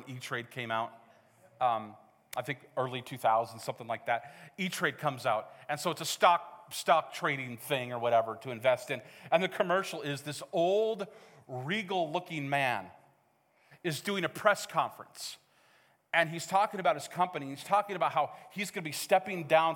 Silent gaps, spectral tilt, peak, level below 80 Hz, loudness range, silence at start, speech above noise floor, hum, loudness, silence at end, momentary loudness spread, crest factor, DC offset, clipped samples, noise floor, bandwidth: none; -4 dB/octave; -8 dBFS; -86 dBFS; 4 LU; 0 s; 38 dB; none; -32 LUFS; 0 s; 11 LU; 24 dB; under 0.1%; under 0.1%; -70 dBFS; 18 kHz